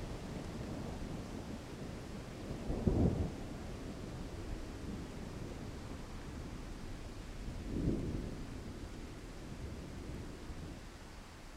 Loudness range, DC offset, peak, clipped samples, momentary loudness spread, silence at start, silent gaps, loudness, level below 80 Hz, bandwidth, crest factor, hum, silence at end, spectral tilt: 7 LU; under 0.1%; -16 dBFS; under 0.1%; 11 LU; 0 s; none; -44 LUFS; -48 dBFS; 16 kHz; 26 dB; none; 0 s; -6.5 dB/octave